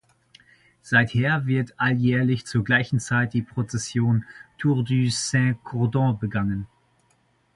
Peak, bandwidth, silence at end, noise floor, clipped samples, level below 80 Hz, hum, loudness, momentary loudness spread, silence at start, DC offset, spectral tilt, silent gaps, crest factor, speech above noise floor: -4 dBFS; 11.5 kHz; 0.9 s; -65 dBFS; under 0.1%; -52 dBFS; none; -23 LUFS; 7 LU; 0.85 s; under 0.1%; -5.5 dB/octave; none; 20 dB; 42 dB